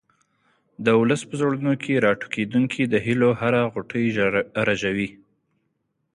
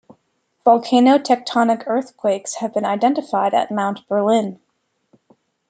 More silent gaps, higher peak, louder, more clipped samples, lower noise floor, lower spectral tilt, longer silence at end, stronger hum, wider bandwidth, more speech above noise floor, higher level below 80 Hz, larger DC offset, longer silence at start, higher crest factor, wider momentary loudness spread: neither; about the same, -4 dBFS vs -2 dBFS; second, -22 LUFS vs -18 LUFS; neither; first, -73 dBFS vs -68 dBFS; first, -6.5 dB/octave vs -5 dB/octave; about the same, 1.05 s vs 1.15 s; neither; first, 11 kHz vs 9.4 kHz; about the same, 52 dB vs 51 dB; first, -58 dBFS vs -70 dBFS; neither; first, 0.8 s vs 0.65 s; about the same, 18 dB vs 18 dB; second, 6 LU vs 9 LU